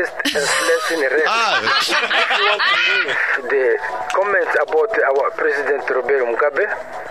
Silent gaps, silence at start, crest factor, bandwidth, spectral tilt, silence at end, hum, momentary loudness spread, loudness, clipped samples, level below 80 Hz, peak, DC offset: none; 0 s; 14 dB; 15.5 kHz; -1 dB/octave; 0 s; none; 5 LU; -16 LUFS; under 0.1%; -60 dBFS; -4 dBFS; 0.4%